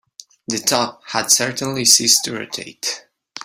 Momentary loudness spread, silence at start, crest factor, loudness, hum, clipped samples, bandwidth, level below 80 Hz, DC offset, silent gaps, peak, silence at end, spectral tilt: 16 LU; 0.5 s; 20 dB; -16 LUFS; none; under 0.1%; 16 kHz; -62 dBFS; under 0.1%; none; 0 dBFS; 0.05 s; -1 dB/octave